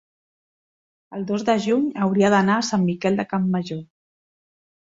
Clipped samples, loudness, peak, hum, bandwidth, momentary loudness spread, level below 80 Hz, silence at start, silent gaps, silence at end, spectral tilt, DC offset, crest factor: under 0.1%; -21 LUFS; -4 dBFS; none; 7.8 kHz; 15 LU; -62 dBFS; 1.1 s; none; 1.05 s; -6 dB/octave; under 0.1%; 18 dB